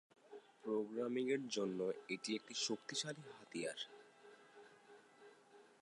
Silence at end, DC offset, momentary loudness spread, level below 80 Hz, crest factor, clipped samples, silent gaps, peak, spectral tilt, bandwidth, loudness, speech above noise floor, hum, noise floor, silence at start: 0.2 s; under 0.1%; 23 LU; under -90 dBFS; 18 dB; under 0.1%; none; -26 dBFS; -3.5 dB/octave; 11.5 kHz; -43 LUFS; 23 dB; none; -66 dBFS; 0.25 s